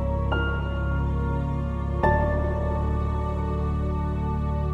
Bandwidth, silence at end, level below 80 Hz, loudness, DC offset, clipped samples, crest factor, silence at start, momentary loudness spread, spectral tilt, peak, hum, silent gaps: 4.4 kHz; 0 s; -28 dBFS; -26 LUFS; under 0.1%; under 0.1%; 16 dB; 0 s; 4 LU; -9 dB/octave; -8 dBFS; none; none